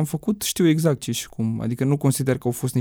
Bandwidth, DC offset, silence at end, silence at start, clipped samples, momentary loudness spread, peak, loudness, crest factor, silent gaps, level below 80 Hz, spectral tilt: 19.5 kHz; under 0.1%; 0 s; 0 s; under 0.1%; 7 LU; -6 dBFS; -22 LUFS; 16 dB; none; -54 dBFS; -5.5 dB/octave